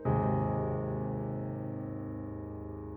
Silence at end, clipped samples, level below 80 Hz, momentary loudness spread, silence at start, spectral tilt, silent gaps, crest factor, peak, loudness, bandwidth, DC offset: 0 s; under 0.1%; -50 dBFS; 11 LU; 0 s; -13 dB/octave; none; 16 dB; -18 dBFS; -35 LUFS; 3.3 kHz; under 0.1%